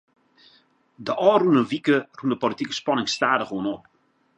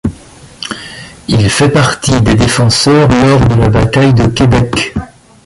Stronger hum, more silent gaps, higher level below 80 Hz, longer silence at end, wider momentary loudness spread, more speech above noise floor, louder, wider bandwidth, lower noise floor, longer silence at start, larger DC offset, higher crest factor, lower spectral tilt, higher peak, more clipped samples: neither; neither; second, -68 dBFS vs -26 dBFS; first, 0.6 s vs 0.4 s; second, 11 LU vs 15 LU; first, 38 dB vs 27 dB; second, -22 LUFS vs -9 LUFS; second, 9.8 kHz vs 11.5 kHz; first, -60 dBFS vs -35 dBFS; first, 1 s vs 0.05 s; neither; first, 20 dB vs 10 dB; about the same, -5 dB/octave vs -5.5 dB/octave; second, -4 dBFS vs 0 dBFS; neither